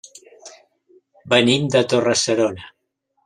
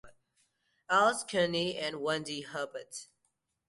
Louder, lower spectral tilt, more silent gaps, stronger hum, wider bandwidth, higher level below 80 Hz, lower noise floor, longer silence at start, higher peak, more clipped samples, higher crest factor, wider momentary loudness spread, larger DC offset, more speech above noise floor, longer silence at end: first, -17 LUFS vs -31 LUFS; about the same, -4 dB/octave vs -3.5 dB/octave; neither; neither; about the same, 12.5 kHz vs 11.5 kHz; first, -60 dBFS vs -72 dBFS; second, -71 dBFS vs -80 dBFS; first, 0.45 s vs 0.05 s; first, -2 dBFS vs -14 dBFS; neither; about the same, 20 dB vs 20 dB; second, 7 LU vs 16 LU; neither; first, 54 dB vs 48 dB; about the same, 0.55 s vs 0.65 s